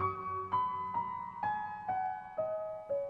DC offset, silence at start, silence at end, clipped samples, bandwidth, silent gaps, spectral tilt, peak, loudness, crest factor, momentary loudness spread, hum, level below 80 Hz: under 0.1%; 0 s; 0 s; under 0.1%; 6.4 kHz; none; -7.5 dB/octave; -22 dBFS; -37 LUFS; 14 dB; 5 LU; none; -70 dBFS